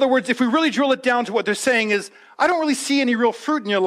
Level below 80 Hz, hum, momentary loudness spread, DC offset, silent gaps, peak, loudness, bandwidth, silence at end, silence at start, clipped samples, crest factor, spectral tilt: -68 dBFS; none; 4 LU; under 0.1%; none; -6 dBFS; -19 LUFS; 14.5 kHz; 0 s; 0 s; under 0.1%; 14 dB; -3.5 dB/octave